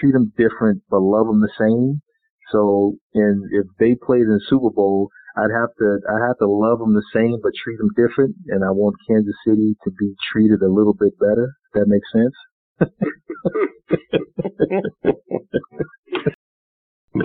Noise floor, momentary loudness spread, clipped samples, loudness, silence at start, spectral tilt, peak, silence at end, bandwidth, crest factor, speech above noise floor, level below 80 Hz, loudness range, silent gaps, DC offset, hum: under -90 dBFS; 8 LU; under 0.1%; -19 LUFS; 0 s; -6.5 dB/octave; 0 dBFS; 0 s; 4.3 kHz; 18 dB; over 72 dB; -52 dBFS; 5 LU; 2.30-2.39 s, 3.01-3.10 s, 12.51-12.76 s, 15.98-16.03 s, 16.34-17.08 s; under 0.1%; none